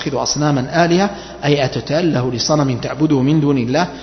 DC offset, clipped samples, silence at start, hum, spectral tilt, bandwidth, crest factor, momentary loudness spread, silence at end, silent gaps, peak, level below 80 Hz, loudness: under 0.1%; under 0.1%; 0 s; none; -5.5 dB/octave; 6.4 kHz; 14 dB; 4 LU; 0 s; none; 0 dBFS; -44 dBFS; -16 LUFS